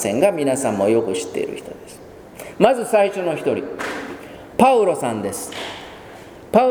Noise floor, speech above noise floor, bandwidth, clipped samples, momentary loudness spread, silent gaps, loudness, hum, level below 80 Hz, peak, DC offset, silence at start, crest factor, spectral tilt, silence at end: -39 dBFS; 20 dB; over 20 kHz; under 0.1%; 22 LU; none; -19 LUFS; none; -54 dBFS; 0 dBFS; under 0.1%; 0 s; 20 dB; -4.5 dB/octave; 0 s